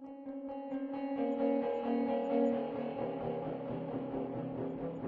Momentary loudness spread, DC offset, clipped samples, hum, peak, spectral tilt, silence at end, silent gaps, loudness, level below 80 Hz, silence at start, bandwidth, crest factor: 8 LU; under 0.1%; under 0.1%; none; -20 dBFS; -7 dB/octave; 0 s; none; -37 LUFS; -68 dBFS; 0 s; 4.7 kHz; 16 dB